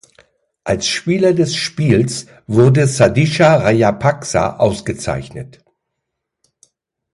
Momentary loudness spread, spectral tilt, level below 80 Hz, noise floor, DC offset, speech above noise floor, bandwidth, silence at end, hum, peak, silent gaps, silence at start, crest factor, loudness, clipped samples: 12 LU; -5.5 dB/octave; -42 dBFS; -77 dBFS; under 0.1%; 63 dB; 11.5 kHz; 1.7 s; none; 0 dBFS; none; 0.65 s; 16 dB; -15 LUFS; under 0.1%